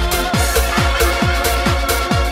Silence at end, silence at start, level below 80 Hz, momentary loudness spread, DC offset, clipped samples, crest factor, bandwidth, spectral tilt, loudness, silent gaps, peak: 0 s; 0 s; -20 dBFS; 1 LU; under 0.1%; under 0.1%; 14 dB; 16.5 kHz; -4 dB/octave; -16 LUFS; none; -2 dBFS